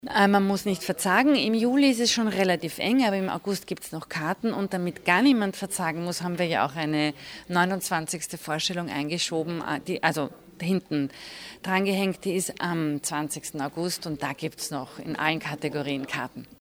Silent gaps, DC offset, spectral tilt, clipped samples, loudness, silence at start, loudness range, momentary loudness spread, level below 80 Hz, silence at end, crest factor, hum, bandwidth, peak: none; under 0.1%; -4 dB/octave; under 0.1%; -26 LUFS; 0.05 s; 6 LU; 11 LU; -64 dBFS; 0.15 s; 20 dB; none; over 20 kHz; -6 dBFS